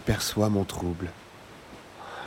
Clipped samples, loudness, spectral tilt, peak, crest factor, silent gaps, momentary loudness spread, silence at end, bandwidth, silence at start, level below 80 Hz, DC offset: under 0.1%; -28 LUFS; -5 dB/octave; -10 dBFS; 20 dB; none; 22 LU; 0 s; 16.5 kHz; 0 s; -48 dBFS; under 0.1%